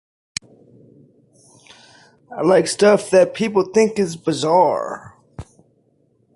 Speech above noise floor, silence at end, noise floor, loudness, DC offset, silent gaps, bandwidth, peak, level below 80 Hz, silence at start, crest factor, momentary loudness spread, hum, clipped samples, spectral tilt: 45 dB; 0.95 s; -61 dBFS; -17 LUFS; under 0.1%; none; 11.5 kHz; -2 dBFS; -56 dBFS; 2.3 s; 18 dB; 21 LU; none; under 0.1%; -5 dB/octave